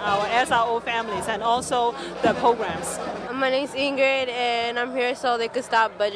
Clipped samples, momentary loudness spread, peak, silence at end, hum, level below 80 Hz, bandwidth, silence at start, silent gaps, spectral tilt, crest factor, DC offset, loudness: under 0.1%; 6 LU; -8 dBFS; 0 s; none; -56 dBFS; 11 kHz; 0 s; none; -3 dB/octave; 14 dB; under 0.1%; -23 LUFS